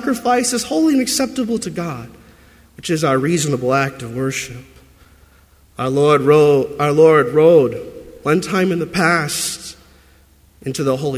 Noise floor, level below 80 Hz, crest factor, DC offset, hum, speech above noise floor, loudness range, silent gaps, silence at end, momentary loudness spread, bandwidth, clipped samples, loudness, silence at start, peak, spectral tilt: -50 dBFS; -50 dBFS; 16 dB; under 0.1%; none; 34 dB; 7 LU; none; 0 s; 16 LU; 16 kHz; under 0.1%; -16 LUFS; 0 s; 0 dBFS; -5 dB/octave